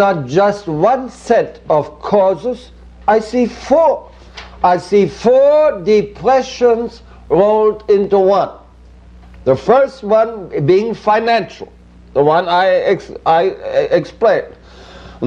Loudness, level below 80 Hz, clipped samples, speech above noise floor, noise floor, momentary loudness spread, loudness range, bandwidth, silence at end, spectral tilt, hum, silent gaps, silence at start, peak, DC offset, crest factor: -14 LUFS; -42 dBFS; under 0.1%; 27 dB; -40 dBFS; 9 LU; 2 LU; 9.4 kHz; 0 s; -6.5 dB/octave; none; none; 0 s; 0 dBFS; under 0.1%; 14 dB